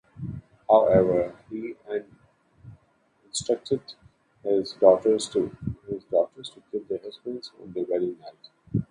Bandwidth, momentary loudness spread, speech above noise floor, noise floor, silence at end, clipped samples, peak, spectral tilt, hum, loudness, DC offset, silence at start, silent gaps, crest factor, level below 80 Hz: 11 kHz; 19 LU; 40 dB; -65 dBFS; 0.05 s; under 0.1%; -4 dBFS; -6 dB/octave; none; -26 LUFS; under 0.1%; 0.15 s; none; 22 dB; -56 dBFS